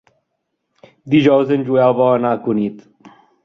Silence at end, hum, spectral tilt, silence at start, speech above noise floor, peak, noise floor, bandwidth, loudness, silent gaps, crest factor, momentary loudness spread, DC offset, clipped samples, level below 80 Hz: 0.35 s; none; -8.5 dB/octave; 1.05 s; 58 dB; -2 dBFS; -73 dBFS; 6.6 kHz; -15 LUFS; none; 16 dB; 7 LU; under 0.1%; under 0.1%; -60 dBFS